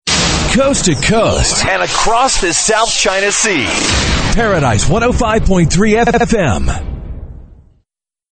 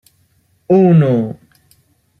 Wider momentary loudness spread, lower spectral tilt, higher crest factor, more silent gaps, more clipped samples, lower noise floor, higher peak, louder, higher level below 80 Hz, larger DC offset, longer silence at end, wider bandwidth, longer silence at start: second, 4 LU vs 17 LU; second, -3.5 dB/octave vs -10.5 dB/octave; about the same, 12 dB vs 14 dB; neither; neither; first, -68 dBFS vs -58 dBFS; about the same, 0 dBFS vs -2 dBFS; about the same, -12 LUFS vs -13 LUFS; first, -22 dBFS vs -56 dBFS; neither; about the same, 0.8 s vs 0.9 s; first, 9.2 kHz vs 4.1 kHz; second, 0.05 s vs 0.7 s